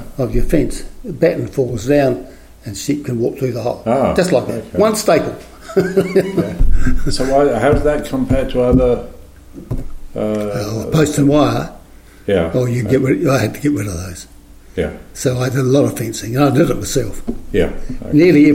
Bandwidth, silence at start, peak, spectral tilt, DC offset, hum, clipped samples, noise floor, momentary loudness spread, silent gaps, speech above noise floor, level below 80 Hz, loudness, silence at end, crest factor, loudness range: 16.5 kHz; 0 s; 0 dBFS; -6.5 dB/octave; under 0.1%; none; under 0.1%; -40 dBFS; 14 LU; none; 25 dB; -24 dBFS; -16 LUFS; 0 s; 14 dB; 3 LU